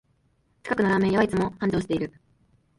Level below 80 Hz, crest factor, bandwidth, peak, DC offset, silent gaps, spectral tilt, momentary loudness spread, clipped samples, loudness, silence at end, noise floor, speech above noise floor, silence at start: -52 dBFS; 18 dB; 11.5 kHz; -8 dBFS; under 0.1%; none; -7 dB/octave; 10 LU; under 0.1%; -25 LUFS; 0.7 s; -67 dBFS; 43 dB; 0.65 s